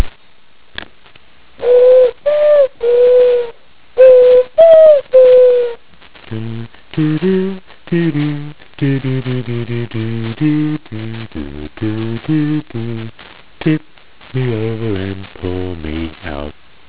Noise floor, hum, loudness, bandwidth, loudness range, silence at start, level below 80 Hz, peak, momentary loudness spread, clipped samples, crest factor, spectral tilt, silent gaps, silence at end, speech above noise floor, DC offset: -50 dBFS; none; -12 LUFS; 4 kHz; 12 LU; 0 s; -40 dBFS; 0 dBFS; 20 LU; 0.2%; 14 dB; -11.5 dB/octave; none; 0.4 s; 36 dB; 3%